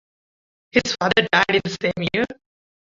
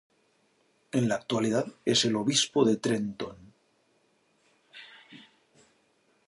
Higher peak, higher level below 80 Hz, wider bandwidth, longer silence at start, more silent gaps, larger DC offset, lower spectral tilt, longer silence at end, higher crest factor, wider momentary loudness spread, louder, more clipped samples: first, -2 dBFS vs -10 dBFS; first, -52 dBFS vs -70 dBFS; second, 7.8 kHz vs 11.5 kHz; second, 0.75 s vs 0.95 s; neither; neither; about the same, -4 dB/octave vs -4 dB/octave; second, 0.55 s vs 1.1 s; about the same, 20 dB vs 22 dB; second, 8 LU vs 23 LU; first, -20 LUFS vs -27 LUFS; neither